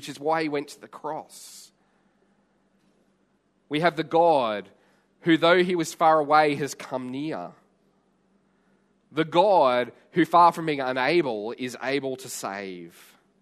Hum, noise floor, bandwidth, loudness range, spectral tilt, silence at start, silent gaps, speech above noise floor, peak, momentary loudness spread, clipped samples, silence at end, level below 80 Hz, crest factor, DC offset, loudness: none; -68 dBFS; 13.5 kHz; 11 LU; -5 dB/octave; 0 s; none; 44 dB; -4 dBFS; 17 LU; under 0.1%; 0.55 s; -74 dBFS; 20 dB; under 0.1%; -24 LUFS